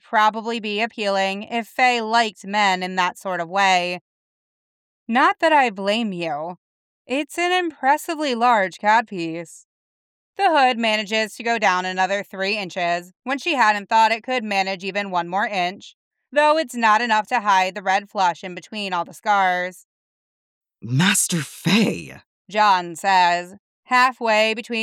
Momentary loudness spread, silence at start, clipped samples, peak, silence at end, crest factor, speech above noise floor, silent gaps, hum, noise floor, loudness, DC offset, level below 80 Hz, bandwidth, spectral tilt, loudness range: 10 LU; 0.1 s; under 0.1%; -2 dBFS; 0 s; 18 dB; over 70 dB; 4.01-5.06 s, 6.58-7.05 s, 9.65-10.33 s, 13.16-13.20 s, 15.94-16.11 s, 19.85-20.61 s, 22.26-22.45 s, 23.59-23.83 s; none; under -90 dBFS; -20 LUFS; under 0.1%; -74 dBFS; 17 kHz; -3.5 dB/octave; 2 LU